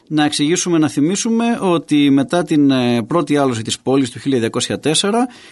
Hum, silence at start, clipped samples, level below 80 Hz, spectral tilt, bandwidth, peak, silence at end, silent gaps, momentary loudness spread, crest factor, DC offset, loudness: none; 0.1 s; under 0.1%; -58 dBFS; -4.5 dB/octave; 11.5 kHz; -2 dBFS; 0.15 s; none; 5 LU; 12 dB; under 0.1%; -16 LUFS